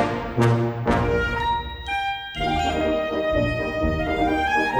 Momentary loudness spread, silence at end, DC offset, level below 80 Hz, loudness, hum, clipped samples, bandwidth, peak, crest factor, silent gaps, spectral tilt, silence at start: 5 LU; 0 s; under 0.1%; -34 dBFS; -23 LUFS; none; under 0.1%; over 20 kHz; -6 dBFS; 16 dB; none; -6.5 dB/octave; 0 s